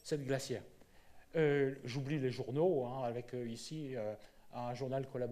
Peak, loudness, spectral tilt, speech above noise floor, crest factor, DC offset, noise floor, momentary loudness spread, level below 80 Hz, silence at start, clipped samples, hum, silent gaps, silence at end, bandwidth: -20 dBFS; -39 LUFS; -6.5 dB/octave; 22 dB; 18 dB; under 0.1%; -59 dBFS; 11 LU; -68 dBFS; 0.05 s; under 0.1%; none; none; 0 s; 14.5 kHz